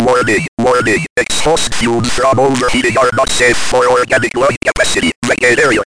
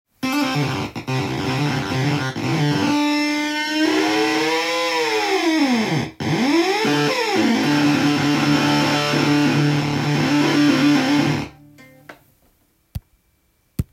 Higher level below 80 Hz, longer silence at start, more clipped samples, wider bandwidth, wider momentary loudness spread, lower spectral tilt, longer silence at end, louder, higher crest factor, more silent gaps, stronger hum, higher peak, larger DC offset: first, -32 dBFS vs -50 dBFS; second, 0 s vs 0.2 s; neither; second, 10.5 kHz vs 16 kHz; second, 3 LU vs 7 LU; second, -3.5 dB/octave vs -5 dB/octave; about the same, 0.1 s vs 0.1 s; first, -12 LUFS vs -18 LUFS; about the same, 12 dB vs 14 dB; first, 0.48-0.57 s, 1.10-1.16 s, 4.57-4.61 s, 5.16-5.22 s vs none; neither; first, 0 dBFS vs -4 dBFS; neither